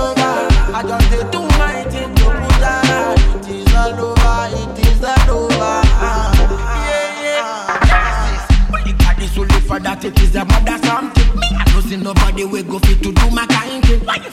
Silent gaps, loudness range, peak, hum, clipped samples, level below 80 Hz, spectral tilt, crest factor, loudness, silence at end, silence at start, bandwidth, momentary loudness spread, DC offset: none; 1 LU; 0 dBFS; none; under 0.1%; -14 dBFS; -5.5 dB/octave; 12 dB; -15 LUFS; 0 s; 0 s; 15 kHz; 5 LU; under 0.1%